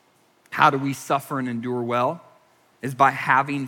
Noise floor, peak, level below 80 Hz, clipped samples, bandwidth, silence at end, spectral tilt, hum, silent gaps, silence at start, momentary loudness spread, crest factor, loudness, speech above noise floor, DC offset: -60 dBFS; -2 dBFS; -74 dBFS; under 0.1%; 18.5 kHz; 0 s; -5.5 dB/octave; none; none; 0.5 s; 15 LU; 22 dB; -22 LUFS; 38 dB; under 0.1%